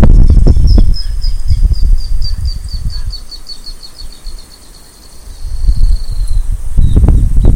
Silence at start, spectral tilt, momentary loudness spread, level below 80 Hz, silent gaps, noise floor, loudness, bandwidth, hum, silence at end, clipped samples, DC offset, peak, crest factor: 0 s; -7 dB/octave; 21 LU; -10 dBFS; none; -34 dBFS; -14 LUFS; 10.5 kHz; none; 0 s; 7%; under 0.1%; 0 dBFS; 8 dB